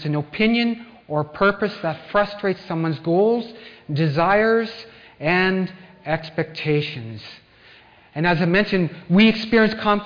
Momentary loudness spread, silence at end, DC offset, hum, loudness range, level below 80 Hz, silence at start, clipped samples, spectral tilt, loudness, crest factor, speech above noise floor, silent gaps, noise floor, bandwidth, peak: 16 LU; 0 s; under 0.1%; none; 4 LU; -50 dBFS; 0 s; under 0.1%; -8 dB/octave; -20 LUFS; 16 dB; 29 dB; none; -50 dBFS; 5.2 kHz; -6 dBFS